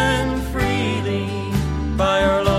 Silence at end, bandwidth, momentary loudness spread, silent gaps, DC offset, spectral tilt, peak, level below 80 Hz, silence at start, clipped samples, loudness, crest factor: 0 s; 16 kHz; 6 LU; none; under 0.1%; -6 dB/octave; -2 dBFS; -30 dBFS; 0 s; under 0.1%; -20 LUFS; 18 dB